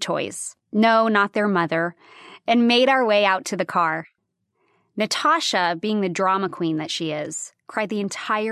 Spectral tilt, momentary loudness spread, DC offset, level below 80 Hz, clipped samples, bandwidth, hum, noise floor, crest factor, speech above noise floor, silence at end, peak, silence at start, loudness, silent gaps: -4 dB/octave; 12 LU; under 0.1%; -74 dBFS; under 0.1%; 13.5 kHz; none; -73 dBFS; 18 dB; 52 dB; 0 s; -4 dBFS; 0 s; -21 LUFS; none